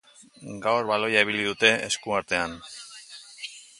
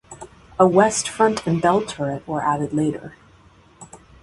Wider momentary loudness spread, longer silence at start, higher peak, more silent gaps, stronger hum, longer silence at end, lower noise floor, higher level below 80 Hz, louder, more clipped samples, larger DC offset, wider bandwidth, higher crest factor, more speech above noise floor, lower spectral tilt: about the same, 20 LU vs 19 LU; first, 0.4 s vs 0.1 s; about the same, -2 dBFS vs 0 dBFS; neither; neither; about the same, 0.15 s vs 0.25 s; second, -46 dBFS vs -51 dBFS; second, -62 dBFS vs -54 dBFS; second, -24 LUFS vs -20 LUFS; neither; neither; about the same, 11.5 kHz vs 11.5 kHz; about the same, 24 dB vs 20 dB; second, 20 dB vs 32 dB; second, -2.5 dB/octave vs -5 dB/octave